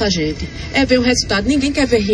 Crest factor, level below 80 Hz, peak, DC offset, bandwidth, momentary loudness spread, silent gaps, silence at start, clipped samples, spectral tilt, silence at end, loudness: 14 dB; -30 dBFS; 0 dBFS; under 0.1%; 10.5 kHz; 7 LU; none; 0 s; under 0.1%; -4 dB/octave; 0 s; -16 LUFS